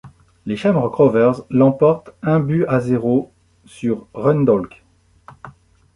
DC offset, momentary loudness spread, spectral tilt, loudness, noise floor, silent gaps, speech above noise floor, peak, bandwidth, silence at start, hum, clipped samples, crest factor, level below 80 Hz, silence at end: under 0.1%; 11 LU; -9 dB/octave; -17 LUFS; -48 dBFS; none; 32 dB; -2 dBFS; 11 kHz; 0.05 s; none; under 0.1%; 16 dB; -52 dBFS; 0.45 s